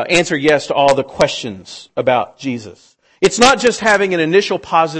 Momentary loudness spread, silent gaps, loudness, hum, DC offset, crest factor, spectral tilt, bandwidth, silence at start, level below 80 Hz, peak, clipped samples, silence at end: 14 LU; none; -14 LUFS; none; under 0.1%; 14 dB; -3.5 dB/octave; 11 kHz; 0 s; -48 dBFS; 0 dBFS; under 0.1%; 0 s